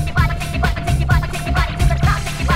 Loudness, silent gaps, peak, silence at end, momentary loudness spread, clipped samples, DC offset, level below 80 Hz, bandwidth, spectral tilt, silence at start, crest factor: -18 LUFS; none; -2 dBFS; 0 s; 3 LU; under 0.1%; under 0.1%; -20 dBFS; 16 kHz; -5.5 dB/octave; 0 s; 14 dB